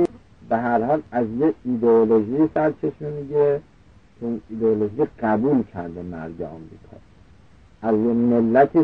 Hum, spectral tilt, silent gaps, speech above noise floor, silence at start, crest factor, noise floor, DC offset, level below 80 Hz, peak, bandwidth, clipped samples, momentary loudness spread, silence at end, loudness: none; -10 dB/octave; none; 31 dB; 0 s; 18 dB; -51 dBFS; 0.2%; -54 dBFS; -4 dBFS; 5 kHz; under 0.1%; 15 LU; 0 s; -21 LUFS